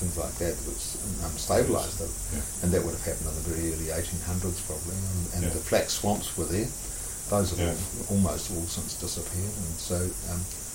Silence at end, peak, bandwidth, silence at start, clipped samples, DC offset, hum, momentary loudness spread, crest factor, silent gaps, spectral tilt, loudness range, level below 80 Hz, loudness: 0 s; -10 dBFS; 16.5 kHz; 0 s; under 0.1%; under 0.1%; none; 6 LU; 18 dB; none; -4.5 dB/octave; 2 LU; -40 dBFS; -29 LUFS